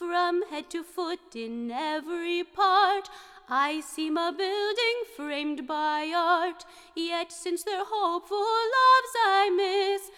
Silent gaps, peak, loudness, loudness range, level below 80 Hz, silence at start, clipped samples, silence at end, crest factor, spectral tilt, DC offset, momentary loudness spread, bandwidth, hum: none; -10 dBFS; -27 LUFS; 4 LU; -70 dBFS; 0 s; under 0.1%; 0.05 s; 16 dB; -1.5 dB/octave; under 0.1%; 13 LU; 16.5 kHz; none